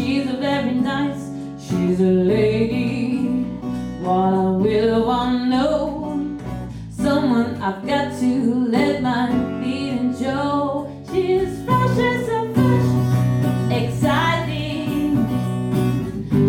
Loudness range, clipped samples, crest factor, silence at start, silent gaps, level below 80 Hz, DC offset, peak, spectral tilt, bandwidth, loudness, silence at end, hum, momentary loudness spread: 2 LU; under 0.1%; 14 dB; 0 s; none; -42 dBFS; under 0.1%; -4 dBFS; -7.5 dB/octave; 16.5 kHz; -20 LUFS; 0 s; none; 8 LU